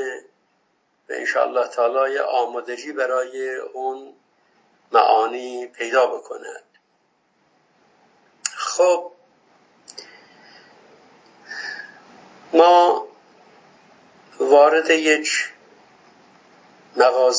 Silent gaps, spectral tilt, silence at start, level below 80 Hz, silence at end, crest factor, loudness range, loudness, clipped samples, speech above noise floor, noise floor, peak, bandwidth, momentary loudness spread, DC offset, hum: none; -1 dB/octave; 0 s; -84 dBFS; 0 s; 20 dB; 8 LU; -19 LUFS; under 0.1%; 48 dB; -66 dBFS; -2 dBFS; 8 kHz; 22 LU; under 0.1%; none